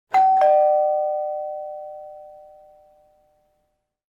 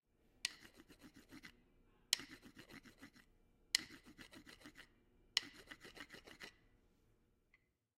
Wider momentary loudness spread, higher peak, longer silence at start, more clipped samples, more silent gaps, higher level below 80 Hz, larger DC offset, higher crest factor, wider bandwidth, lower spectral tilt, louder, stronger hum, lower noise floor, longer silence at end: about the same, 23 LU vs 23 LU; first, -8 dBFS vs -12 dBFS; second, 0.1 s vs 0.45 s; neither; neither; about the same, -72 dBFS vs -76 dBFS; neither; second, 14 dB vs 40 dB; second, 7.2 kHz vs 16 kHz; first, -3.5 dB/octave vs 0.5 dB/octave; first, -19 LUFS vs -44 LUFS; neither; second, -73 dBFS vs -79 dBFS; first, 1.8 s vs 1.3 s